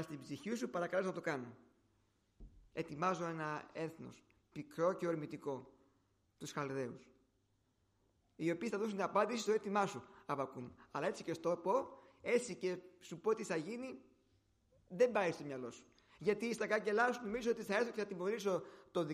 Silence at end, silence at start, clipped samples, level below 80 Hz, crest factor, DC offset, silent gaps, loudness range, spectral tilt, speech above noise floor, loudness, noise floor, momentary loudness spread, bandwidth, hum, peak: 0 s; 0 s; under 0.1%; -74 dBFS; 20 dB; under 0.1%; none; 6 LU; -5 dB/octave; 39 dB; -40 LUFS; -79 dBFS; 15 LU; 15 kHz; none; -20 dBFS